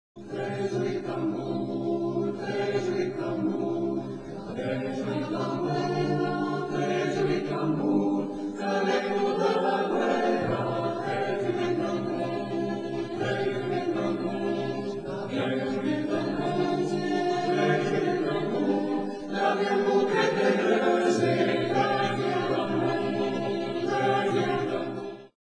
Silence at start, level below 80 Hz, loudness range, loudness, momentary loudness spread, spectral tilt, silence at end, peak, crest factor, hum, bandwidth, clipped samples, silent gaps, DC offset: 0.15 s; -64 dBFS; 5 LU; -28 LUFS; 7 LU; -6.5 dB/octave; 0.15 s; -10 dBFS; 16 dB; none; 10.5 kHz; under 0.1%; none; 0.2%